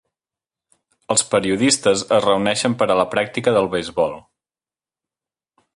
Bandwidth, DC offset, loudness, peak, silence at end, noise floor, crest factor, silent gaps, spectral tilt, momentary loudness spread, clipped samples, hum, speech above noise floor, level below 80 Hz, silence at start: 11.5 kHz; under 0.1%; -18 LUFS; -2 dBFS; 1.55 s; under -90 dBFS; 18 dB; none; -3.5 dB/octave; 6 LU; under 0.1%; none; over 72 dB; -56 dBFS; 1.1 s